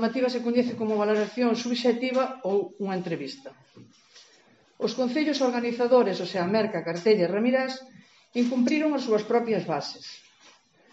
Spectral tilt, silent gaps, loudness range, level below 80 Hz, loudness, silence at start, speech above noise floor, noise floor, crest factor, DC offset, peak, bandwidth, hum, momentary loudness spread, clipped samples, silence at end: -4 dB/octave; none; 5 LU; -80 dBFS; -26 LUFS; 0 s; 34 dB; -60 dBFS; 18 dB; under 0.1%; -8 dBFS; 8 kHz; none; 11 LU; under 0.1%; 0.75 s